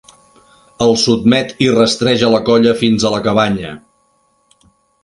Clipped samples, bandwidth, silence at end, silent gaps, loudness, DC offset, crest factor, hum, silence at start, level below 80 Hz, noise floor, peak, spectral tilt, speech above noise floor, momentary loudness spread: under 0.1%; 11 kHz; 1.25 s; none; -13 LUFS; under 0.1%; 14 dB; none; 0.8 s; -46 dBFS; -58 dBFS; 0 dBFS; -5 dB/octave; 46 dB; 5 LU